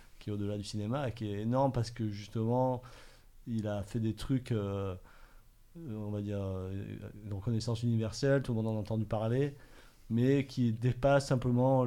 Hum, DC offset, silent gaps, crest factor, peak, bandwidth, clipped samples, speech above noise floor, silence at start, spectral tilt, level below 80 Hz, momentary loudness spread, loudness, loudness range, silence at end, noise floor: none; under 0.1%; none; 18 dB; -16 dBFS; 13 kHz; under 0.1%; 25 dB; 0 s; -7.5 dB/octave; -54 dBFS; 12 LU; -34 LUFS; 6 LU; 0 s; -58 dBFS